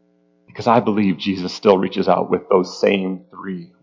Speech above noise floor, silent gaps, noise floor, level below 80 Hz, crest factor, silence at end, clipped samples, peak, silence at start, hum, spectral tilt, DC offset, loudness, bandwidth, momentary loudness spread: 39 dB; none; -57 dBFS; -56 dBFS; 18 dB; 0.15 s; under 0.1%; 0 dBFS; 0.55 s; none; -6.5 dB/octave; under 0.1%; -18 LUFS; 7.6 kHz; 14 LU